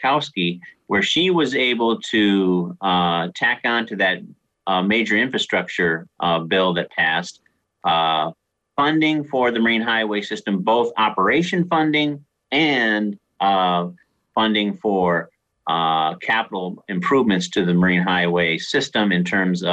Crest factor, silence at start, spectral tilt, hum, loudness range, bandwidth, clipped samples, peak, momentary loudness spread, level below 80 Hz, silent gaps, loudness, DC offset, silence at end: 12 dB; 0 s; -5 dB/octave; none; 2 LU; 8.8 kHz; under 0.1%; -8 dBFS; 7 LU; -60 dBFS; none; -19 LUFS; under 0.1%; 0 s